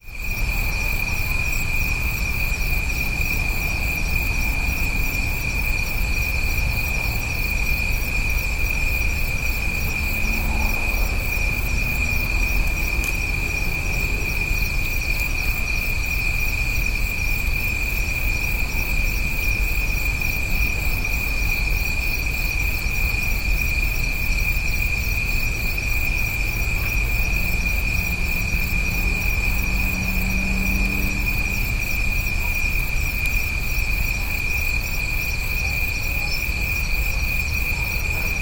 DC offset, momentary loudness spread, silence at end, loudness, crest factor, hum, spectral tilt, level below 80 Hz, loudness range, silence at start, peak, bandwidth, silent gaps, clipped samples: under 0.1%; 1 LU; 0 s; -22 LUFS; 14 dB; none; -3.5 dB/octave; -24 dBFS; 1 LU; 0.05 s; -8 dBFS; 17 kHz; none; under 0.1%